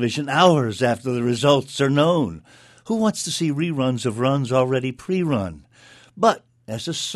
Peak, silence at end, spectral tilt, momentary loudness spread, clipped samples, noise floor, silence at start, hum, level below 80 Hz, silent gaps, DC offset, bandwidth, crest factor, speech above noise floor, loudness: 0 dBFS; 0 s; -5.5 dB/octave; 11 LU; under 0.1%; -50 dBFS; 0 s; none; -56 dBFS; none; under 0.1%; 12.5 kHz; 20 dB; 30 dB; -21 LUFS